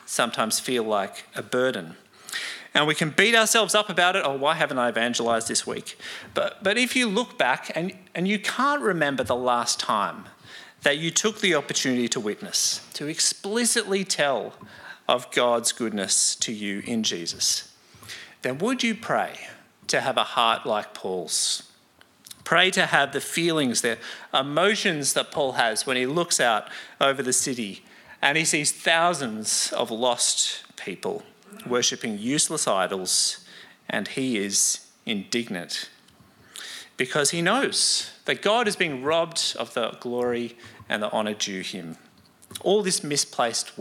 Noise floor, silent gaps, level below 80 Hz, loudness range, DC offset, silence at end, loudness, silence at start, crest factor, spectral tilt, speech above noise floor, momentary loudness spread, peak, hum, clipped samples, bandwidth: -57 dBFS; none; -72 dBFS; 4 LU; under 0.1%; 0 s; -23 LUFS; 0.05 s; 26 dB; -2 dB/octave; 33 dB; 13 LU; 0 dBFS; none; under 0.1%; 17 kHz